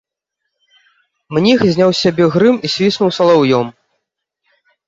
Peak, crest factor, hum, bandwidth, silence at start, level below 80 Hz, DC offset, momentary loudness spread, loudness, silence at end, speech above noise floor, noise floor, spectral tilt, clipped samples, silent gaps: 0 dBFS; 14 dB; none; 7.8 kHz; 1.3 s; -54 dBFS; under 0.1%; 5 LU; -13 LUFS; 1.15 s; 64 dB; -76 dBFS; -6 dB/octave; under 0.1%; none